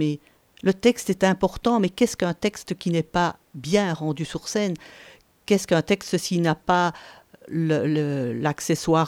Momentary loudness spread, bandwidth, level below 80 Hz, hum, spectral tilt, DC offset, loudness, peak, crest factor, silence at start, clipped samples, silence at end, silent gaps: 7 LU; 17 kHz; -52 dBFS; none; -5.5 dB/octave; under 0.1%; -24 LUFS; -4 dBFS; 20 dB; 0 s; under 0.1%; 0 s; none